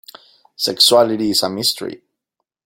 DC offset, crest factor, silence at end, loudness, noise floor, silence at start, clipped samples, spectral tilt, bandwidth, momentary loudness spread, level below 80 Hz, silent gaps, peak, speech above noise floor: under 0.1%; 18 dB; 0.7 s; -15 LUFS; -78 dBFS; 0.6 s; under 0.1%; -2.5 dB/octave; 16.5 kHz; 13 LU; -60 dBFS; none; 0 dBFS; 62 dB